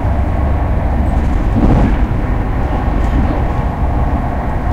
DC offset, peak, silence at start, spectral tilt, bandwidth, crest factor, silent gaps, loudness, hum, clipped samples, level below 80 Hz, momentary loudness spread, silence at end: under 0.1%; -2 dBFS; 0 s; -9 dB/octave; 7.2 kHz; 10 dB; none; -16 LUFS; none; under 0.1%; -16 dBFS; 5 LU; 0 s